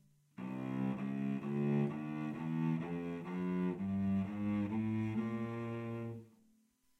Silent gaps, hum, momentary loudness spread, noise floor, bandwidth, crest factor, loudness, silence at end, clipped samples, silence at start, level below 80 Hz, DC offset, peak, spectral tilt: none; none; 8 LU; -73 dBFS; 7.8 kHz; 16 dB; -39 LUFS; 0.7 s; under 0.1%; 0.4 s; -72 dBFS; under 0.1%; -24 dBFS; -9.5 dB/octave